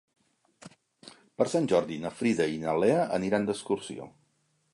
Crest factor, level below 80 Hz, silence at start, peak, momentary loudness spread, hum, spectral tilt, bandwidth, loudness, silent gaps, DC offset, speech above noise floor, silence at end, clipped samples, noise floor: 20 dB; -66 dBFS; 0.65 s; -10 dBFS; 16 LU; none; -5.5 dB/octave; 11.5 kHz; -28 LUFS; none; under 0.1%; 44 dB; 0.65 s; under 0.1%; -72 dBFS